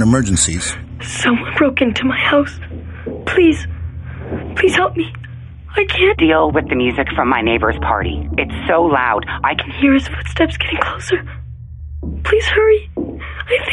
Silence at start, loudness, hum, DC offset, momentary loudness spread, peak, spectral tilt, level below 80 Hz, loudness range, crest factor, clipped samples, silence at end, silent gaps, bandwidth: 0 s; -16 LUFS; none; under 0.1%; 16 LU; 0 dBFS; -4.5 dB/octave; -30 dBFS; 3 LU; 16 dB; under 0.1%; 0 s; none; 11.5 kHz